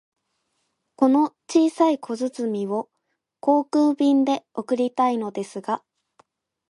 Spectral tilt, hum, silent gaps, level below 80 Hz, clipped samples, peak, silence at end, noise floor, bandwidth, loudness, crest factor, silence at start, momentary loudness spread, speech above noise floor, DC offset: -5.5 dB/octave; none; none; -76 dBFS; under 0.1%; -6 dBFS; 0.9 s; -77 dBFS; 11.5 kHz; -22 LUFS; 18 dB; 1 s; 11 LU; 55 dB; under 0.1%